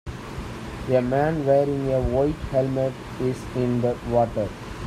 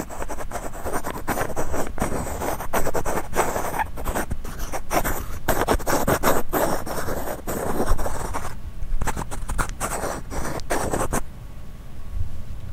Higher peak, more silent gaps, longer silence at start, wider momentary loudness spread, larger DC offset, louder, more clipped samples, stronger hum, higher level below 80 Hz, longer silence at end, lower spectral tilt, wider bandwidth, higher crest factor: second, -6 dBFS vs -2 dBFS; neither; about the same, 0.05 s vs 0 s; about the same, 13 LU vs 12 LU; neither; first, -24 LUFS vs -27 LUFS; neither; neither; second, -40 dBFS vs -30 dBFS; about the same, 0 s vs 0 s; first, -8 dB/octave vs -4.5 dB/octave; second, 14 kHz vs 16 kHz; about the same, 16 dB vs 20 dB